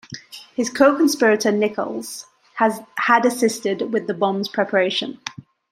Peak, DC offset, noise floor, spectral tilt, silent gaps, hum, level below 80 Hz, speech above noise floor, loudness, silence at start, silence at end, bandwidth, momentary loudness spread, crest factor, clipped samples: -2 dBFS; under 0.1%; -39 dBFS; -4 dB/octave; none; none; -68 dBFS; 20 dB; -19 LUFS; 0.1 s; 0.3 s; 16 kHz; 17 LU; 18 dB; under 0.1%